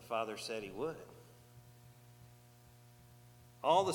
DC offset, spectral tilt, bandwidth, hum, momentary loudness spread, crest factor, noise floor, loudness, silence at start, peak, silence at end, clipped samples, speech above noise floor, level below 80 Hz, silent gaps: under 0.1%; -4.5 dB/octave; 19 kHz; 60 Hz at -60 dBFS; 24 LU; 22 dB; -61 dBFS; -38 LUFS; 0 s; -18 dBFS; 0 s; under 0.1%; 26 dB; -72 dBFS; none